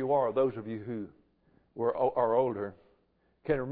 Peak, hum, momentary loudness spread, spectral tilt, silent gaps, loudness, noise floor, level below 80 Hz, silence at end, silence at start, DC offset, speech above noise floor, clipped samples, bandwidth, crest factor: -14 dBFS; none; 15 LU; -11 dB/octave; none; -31 LUFS; -71 dBFS; -60 dBFS; 0 s; 0 s; under 0.1%; 41 dB; under 0.1%; 4.6 kHz; 16 dB